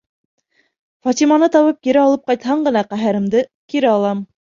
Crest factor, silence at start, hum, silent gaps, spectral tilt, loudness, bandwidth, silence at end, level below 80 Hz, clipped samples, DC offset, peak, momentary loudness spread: 14 dB; 1.05 s; none; 3.54-3.68 s; -5.5 dB/octave; -16 LUFS; 7.6 kHz; 0.25 s; -62 dBFS; under 0.1%; under 0.1%; -2 dBFS; 8 LU